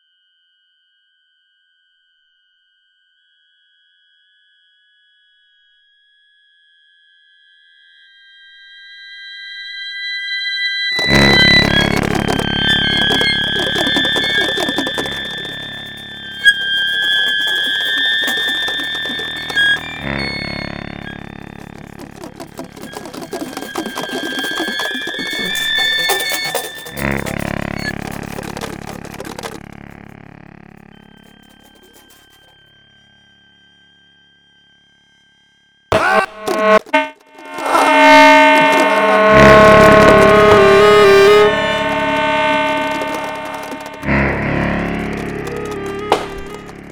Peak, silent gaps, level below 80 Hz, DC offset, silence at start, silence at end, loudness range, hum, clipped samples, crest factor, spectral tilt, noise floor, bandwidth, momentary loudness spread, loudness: 0 dBFS; none; -36 dBFS; under 0.1%; 8.75 s; 0 s; 19 LU; none; under 0.1%; 16 dB; -4 dB/octave; -60 dBFS; over 20 kHz; 22 LU; -13 LUFS